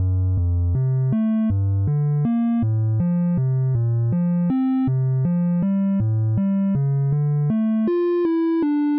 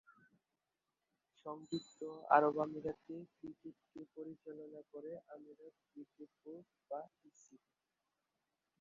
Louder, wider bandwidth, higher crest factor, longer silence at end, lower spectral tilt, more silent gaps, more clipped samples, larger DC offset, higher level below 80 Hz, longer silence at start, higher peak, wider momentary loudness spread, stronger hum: first, -21 LUFS vs -40 LUFS; second, 4.1 kHz vs 7.2 kHz; second, 10 dB vs 30 dB; second, 0 s vs 1.25 s; first, -11.5 dB/octave vs -4.5 dB/octave; neither; neither; neither; first, -40 dBFS vs -84 dBFS; about the same, 0 s vs 0.1 s; first, -10 dBFS vs -14 dBFS; second, 1 LU vs 26 LU; neither